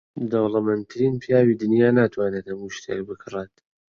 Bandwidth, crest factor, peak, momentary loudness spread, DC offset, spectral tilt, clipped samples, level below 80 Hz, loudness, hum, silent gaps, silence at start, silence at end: 7.2 kHz; 18 dB; -4 dBFS; 14 LU; under 0.1%; -7.5 dB/octave; under 0.1%; -58 dBFS; -22 LUFS; none; none; 0.15 s; 0.5 s